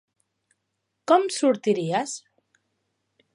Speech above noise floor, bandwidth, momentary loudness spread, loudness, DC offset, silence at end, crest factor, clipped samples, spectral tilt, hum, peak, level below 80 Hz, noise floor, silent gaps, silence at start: 56 dB; 11.5 kHz; 16 LU; -23 LUFS; under 0.1%; 1.15 s; 22 dB; under 0.1%; -4.5 dB/octave; none; -4 dBFS; -80 dBFS; -78 dBFS; none; 1.1 s